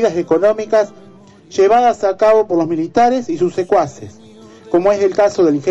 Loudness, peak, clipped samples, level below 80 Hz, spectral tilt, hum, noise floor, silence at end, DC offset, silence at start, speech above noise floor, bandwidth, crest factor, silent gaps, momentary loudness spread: -14 LUFS; -4 dBFS; under 0.1%; -54 dBFS; -6 dB/octave; none; -39 dBFS; 0 s; under 0.1%; 0 s; 26 dB; 8.2 kHz; 10 dB; none; 6 LU